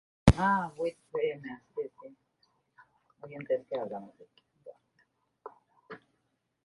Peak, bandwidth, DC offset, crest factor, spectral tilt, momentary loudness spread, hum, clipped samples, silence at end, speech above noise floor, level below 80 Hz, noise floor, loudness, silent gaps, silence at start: -4 dBFS; 11.5 kHz; under 0.1%; 30 dB; -7 dB/octave; 27 LU; none; under 0.1%; 0.7 s; 45 dB; -46 dBFS; -78 dBFS; -32 LUFS; none; 0.25 s